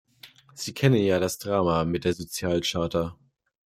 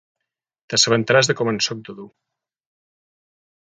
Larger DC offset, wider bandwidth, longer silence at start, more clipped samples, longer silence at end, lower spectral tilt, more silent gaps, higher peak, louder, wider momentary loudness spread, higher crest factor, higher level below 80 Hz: neither; first, 16 kHz vs 10 kHz; second, 0.25 s vs 0.7 s; neither; second, 0.5 s vs 1.55 s; first, -5.5 dB/octave vs -3 dB/octave; neither; second, -6 dBFS vs -2 dBFS; second, -26 LUFS vs -18 LUFS; about the same, 13 LU vs 14 LU; about the same, 20 dB vs 22 dB; first, -54 dBFS vs -64 dBFS